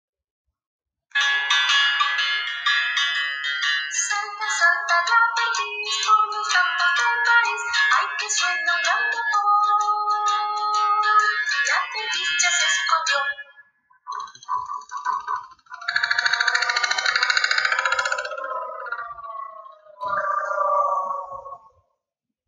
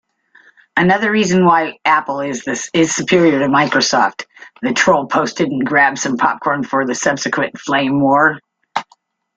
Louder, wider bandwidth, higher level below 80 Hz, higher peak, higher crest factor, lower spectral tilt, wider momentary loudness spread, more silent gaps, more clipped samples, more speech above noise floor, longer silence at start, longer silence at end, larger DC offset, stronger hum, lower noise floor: second, -20 LUFS vs -15 LUFS; about the same, 9.8 kHz vs 9.4 kHz; second, -72 dBFS vs -56 dBFS; second, -4 dBFS vs 0 dBFS; about the same, 18 dB vs 14 dB; second, 3.5 dB/octave vs -4 dB/octave; first, 14 LU vs 9 LU; neither; neither; first, 63 dB vs 41 dB; first, 1.15 s vs 0.75 s; first, 0.9 s vs 0.55 s; neither; neither; first, -84 dBFS vs -55 dBFS